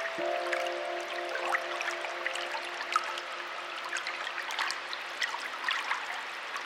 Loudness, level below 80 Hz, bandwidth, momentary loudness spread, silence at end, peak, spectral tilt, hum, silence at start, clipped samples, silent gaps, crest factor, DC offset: -33 LUFS; -84 dBFS; 16 kHz; 5 LU; 0 s; -12 dBFS; 0 dB/octave; none; 0 s; under 0.1%; none; 22 dB; under 0.1%